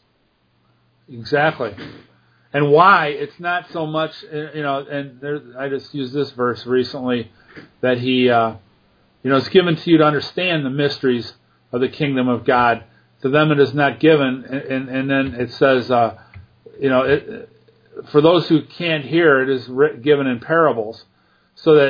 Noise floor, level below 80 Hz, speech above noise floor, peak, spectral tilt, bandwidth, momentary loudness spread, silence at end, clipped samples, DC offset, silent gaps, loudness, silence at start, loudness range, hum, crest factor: -62 dBFS; -58 dBFS; 45 dB; 0 dBFS; -8 dB/octave; 5.2 kHz; 13 LU; 0 s; under 0.1%; under 0.1%; none; -18 LUFS; 1.1 s; 6 LU; none; 18 dB